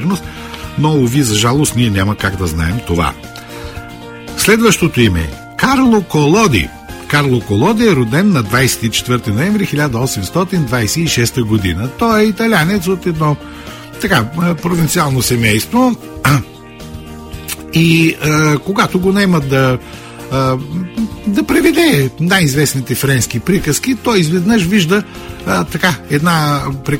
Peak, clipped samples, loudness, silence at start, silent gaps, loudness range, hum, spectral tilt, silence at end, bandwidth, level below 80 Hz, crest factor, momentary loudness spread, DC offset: 0 dBFS; under 0.1%; -13 LUFS; 0 s; none; 2 LU; none; -5 dB/octave; 0 s; 16.5 kHz; -34 dBFS; 14 dB; 14 LU; under 0.1%